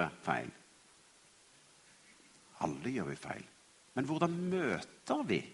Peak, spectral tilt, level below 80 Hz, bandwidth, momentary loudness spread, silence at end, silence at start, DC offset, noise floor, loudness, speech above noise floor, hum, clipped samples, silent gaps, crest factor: -16 dBFS; -6 dB/octave; -72 dBFS; 11.5 kHz; 14 LU; 0 s; 0 s; under 0.1%; -64 dBFS; -37 LUFS; 27 dB; none; under 0.1%; none; 24 dB